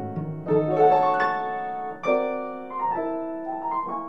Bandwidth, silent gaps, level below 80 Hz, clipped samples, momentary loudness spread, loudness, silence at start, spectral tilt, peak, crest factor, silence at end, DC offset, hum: 7.4 kHz; none; -70 dBFS; under 0.1%; 13 LU; -25 LUFS; 0 s; -8 dB/octave; -8 dBFS; 16 dB; 0 s; 0.4%; none